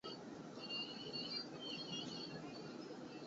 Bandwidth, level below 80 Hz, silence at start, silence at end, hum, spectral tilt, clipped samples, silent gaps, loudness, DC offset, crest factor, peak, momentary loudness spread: 7.6 kHz; -82 dBFS; 0.05 s; 0 s; none; -2.5 dB/octave; under 0.1%; none; -47 LUFS; under 0.1%; 16 dB; -34 dBFS; 7 LU